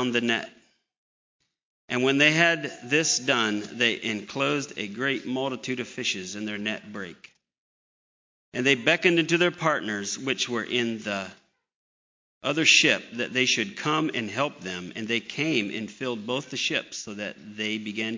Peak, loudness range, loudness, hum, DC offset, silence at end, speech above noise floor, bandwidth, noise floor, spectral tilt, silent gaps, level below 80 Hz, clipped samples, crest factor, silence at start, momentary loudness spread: -4 dBFS; 6 LU; -25 LUFS; none; under 0.1%; 0 s; over 64 dB; 7.6 kHz; under -90 dBFS; -3 dB/octave; 0.98-1.40 s, 1.63-1.88 s, 7.58-8.52 s, 11.75-12.41 s; -72 dBFS; under 0.1%; 24 dB; 0 s; 13 LU